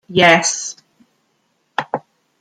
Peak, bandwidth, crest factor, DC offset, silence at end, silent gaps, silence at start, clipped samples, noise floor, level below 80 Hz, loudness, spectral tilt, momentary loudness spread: 0 dBFS; 13 kHz; 18 dB; under 0.1%; 0.4 s; none; 0.1 s; under 0.1%; -65 dBFS; -60 dBFS; -16 LUFS; -2.5 dB/octave; 17 LU